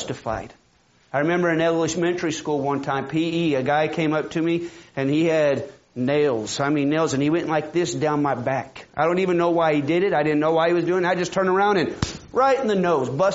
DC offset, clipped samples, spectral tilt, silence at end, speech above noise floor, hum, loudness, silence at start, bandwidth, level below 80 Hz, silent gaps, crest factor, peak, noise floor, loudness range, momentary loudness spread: under 0.1%; under 0.1%; -5 dB/octave; 0 s; 38 dB; none; -22 LUFS; 0 s; 8 kHz; -54 dBFS; none; 16 dB; -4 dBFS; -59 dBFS; 3 LU; 8 LU